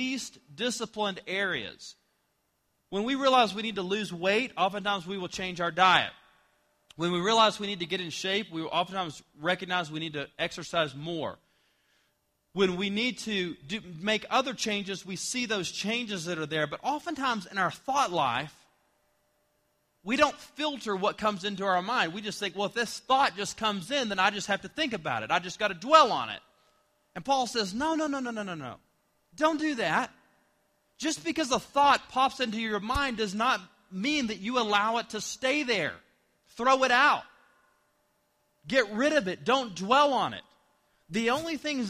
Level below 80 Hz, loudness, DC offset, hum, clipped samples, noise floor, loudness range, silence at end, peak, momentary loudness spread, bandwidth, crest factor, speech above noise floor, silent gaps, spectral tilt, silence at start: -60 dBFS; -28 LUFS; under 0.1%; none; under 0.1%; -75 dBFS; 5 LU; 0 s; -4 dBFS; 12 LU; 15 kHz; 26 dB; 46 dB; none; -3.5 dB/octave; 0 s